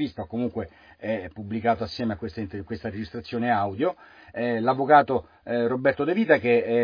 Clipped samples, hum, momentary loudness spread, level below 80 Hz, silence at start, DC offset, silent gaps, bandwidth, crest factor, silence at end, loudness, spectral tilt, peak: under 0.1%; none; 15 LU; -56 dBFS; 0 s; under 0.1%; none; 5.2 kHz; 20 dB; 0 s; -25 LUFS; -8 dB/octave; -4 dBFS